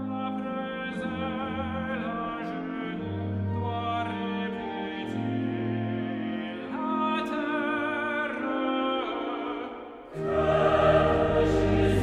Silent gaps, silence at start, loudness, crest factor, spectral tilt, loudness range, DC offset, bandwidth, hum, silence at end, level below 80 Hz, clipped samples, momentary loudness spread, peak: none; 0 s; -28 LUFS; 18 dB; -7.5 dB/octave; 6 LU; under 0.1%; 11.5 kHz; none; 0 s; -44 dBFS; under 0.1%; 10 LU; -10 dBFS